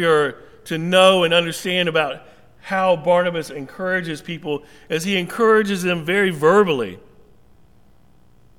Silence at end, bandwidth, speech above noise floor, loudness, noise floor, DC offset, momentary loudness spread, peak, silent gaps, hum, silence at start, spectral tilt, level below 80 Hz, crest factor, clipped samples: 1.6 s; 16.5 kHz; 36 dB; -19 LUFS; -54 dBFS; 0.3%; 14 LU; -2 dBFS; none; none; 0 s; -4.5 dB/octave; -58 dBFS; 18 dB; under 0.1%